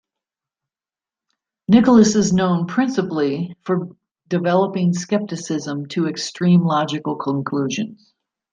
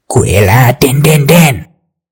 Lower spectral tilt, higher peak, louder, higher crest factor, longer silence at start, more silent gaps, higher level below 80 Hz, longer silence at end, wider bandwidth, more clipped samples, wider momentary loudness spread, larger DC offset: about the same, -6 dB/octave vs -5.5 dB/octave; about the same, -2 dBFS vs 0 dBFS; second, -19 LUFS vs -7 LUFS; first, 18 dB vs 8 dB; first, 1.7 s vs 0.1 s; neither; second, -56 dBFS vs -34 dBFS; about the same, 0.6 s vs 0.5 s; second, 9.4 kHz vs over 20 kHz; second, under 0.1% vs 5%; first, 12 LU vs 4 LU; neither